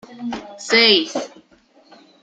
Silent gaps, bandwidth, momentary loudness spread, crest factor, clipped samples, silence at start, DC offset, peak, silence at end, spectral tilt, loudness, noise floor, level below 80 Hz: none; 9.4 kHz; 18 LU; 20 dB; under 0.1%; 0.1 s; under 0.1%; 0 dBFS; 0.95 s; -2 dB/octave; -14 LUFS; -54 dBFS; -62 dBFS